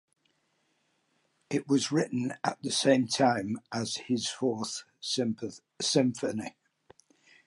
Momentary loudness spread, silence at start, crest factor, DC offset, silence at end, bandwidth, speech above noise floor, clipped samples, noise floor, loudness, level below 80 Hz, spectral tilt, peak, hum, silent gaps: 11 LU; 1.5 s; 20 dB; under 0.1%; 0.95 s; 11.5 kHz; 45 dB; under 0.1%; -74 dBFS; -30 LUFS; -74 dBFS; -4 dB/octave; -10 dBFS; none; none